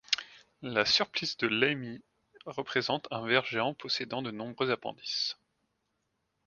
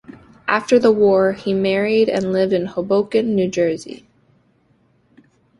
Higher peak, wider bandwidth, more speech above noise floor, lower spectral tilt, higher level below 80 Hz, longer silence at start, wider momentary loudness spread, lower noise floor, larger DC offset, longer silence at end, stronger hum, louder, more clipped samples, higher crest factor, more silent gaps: second, -8 dBFS vs -2 dBFS; second, 7.4 kHz vs 11 kHz; first, 48 dB vs 42 dB; second, -3.5 dB/octave vs -6 dB/octave; second, -72 dBFS vs -56 dBFS; about the same, 0.1 s vs 0.1 s; first, 17 LU vs 7 LU; first, -80 dBFS vs -59 dBFS; neither; second, 1.15 s vs 1.65 s; neither; second, -31 LUFS vs -17 LUFS; neither; first, 26 dB vs 16 dB; neither